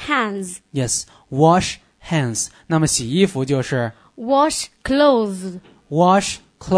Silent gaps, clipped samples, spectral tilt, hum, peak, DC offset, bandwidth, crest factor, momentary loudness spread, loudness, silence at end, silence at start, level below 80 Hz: none; under 0.1%; -4.5 dB/octave; none; -2 dBFS; under 0.1%; 11 kHz; 18 dB; 14 LU; -19 LUFS; 0 s; 0 s; -46 dBFS